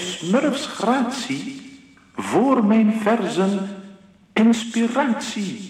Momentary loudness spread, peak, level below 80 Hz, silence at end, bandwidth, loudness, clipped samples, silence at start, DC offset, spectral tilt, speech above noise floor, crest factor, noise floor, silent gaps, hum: 14 LU; -4 dBFS; -66 dBFS; 0 s; 12.5 kHz; -20 LUFS; under 0.1%; 0 s; under 0.1%; -5 dB/octave; 27 dB; 16 dB; -46 dBFS; none; none